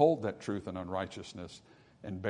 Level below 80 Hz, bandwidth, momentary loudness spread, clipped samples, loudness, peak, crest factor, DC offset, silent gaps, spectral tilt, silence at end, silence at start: -70 dBFS; 10.5 kHz; 15 LU; under 0.1%; -37 LUFS; -12 dBFS; 22 dB; under 0.1%; none; -6.5 dB/octave; 0 s; 0 s